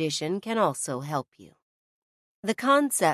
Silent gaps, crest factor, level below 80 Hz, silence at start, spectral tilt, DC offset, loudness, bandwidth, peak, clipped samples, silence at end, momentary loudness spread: 1.28-1.32 s, 1.62-2.43 s; 18 dB; -74 dBFS; 0 s; -4 dB/octave; under 0.1%; -26 LUFS; 14 kHz; -10 dBFS; under 0.1%; 0 s; 11 LU